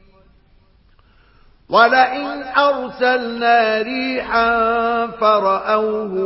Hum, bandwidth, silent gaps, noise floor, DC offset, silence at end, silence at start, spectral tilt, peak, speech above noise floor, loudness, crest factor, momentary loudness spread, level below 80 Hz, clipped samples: none; 5.8 kHz; none; -53 dBFS; under 0.1%; 0 s; 1.7 s; -7.5 dB/octave; 0 dBFS; 36 dB; -16 LUFS; 18 dB; 7 LU; -50 dBFS; under 0.1%